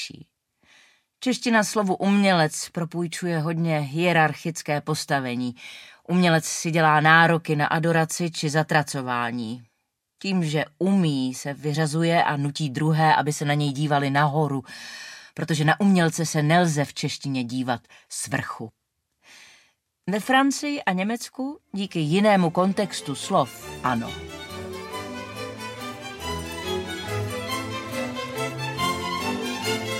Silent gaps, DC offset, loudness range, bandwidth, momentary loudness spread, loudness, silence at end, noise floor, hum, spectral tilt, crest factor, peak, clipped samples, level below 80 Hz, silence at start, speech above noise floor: none; under 0.1%; 9 LU; 16 kHz; 15 LU; -24 LUFS; 0 s; -76 dBFS; none; -5 dB/octave; 24 dB; -2 dBFS; under 0.1%; -58 dBFS; 0 s; 53 dB